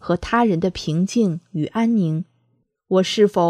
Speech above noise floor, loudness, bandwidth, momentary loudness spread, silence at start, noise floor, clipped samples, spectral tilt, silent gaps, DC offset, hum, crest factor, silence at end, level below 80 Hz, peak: 48 dB; -20 LUFS; 11 kHz; 8 LU; 0.05 s; -66 dBFS; under 0.1%; -6.5 dB/octave; none; under 0.1%; none; 16 dB; 0 s; -48 dBFS; -4 dBFS